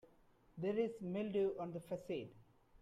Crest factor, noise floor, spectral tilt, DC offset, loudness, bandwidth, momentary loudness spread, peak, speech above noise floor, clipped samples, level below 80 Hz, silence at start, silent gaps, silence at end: 16 dB; -70 dBFS; -8 dB/octave; under 0.1%; -42 LUFS; 13 kHz; 8 LU; -26 dBFS; 29 dB; under 0.1%; -74 dBFS; 0.55 s; none; 0.4 s